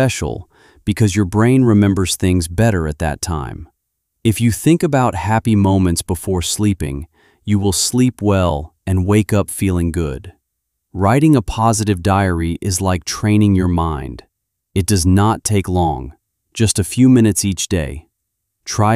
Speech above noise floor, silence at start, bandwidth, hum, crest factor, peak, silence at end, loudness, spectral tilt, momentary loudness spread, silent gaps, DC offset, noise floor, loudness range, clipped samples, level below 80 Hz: 59 dB; 0 s; 15.5 kHz; none; 14 dB; -2 dBFS; 0 s; -16 LUFS; -5.5 dB/octave; 13 LU; none; under 0.1%; -74 dBFS; 2 LU; under 0.1%; -34 dBFS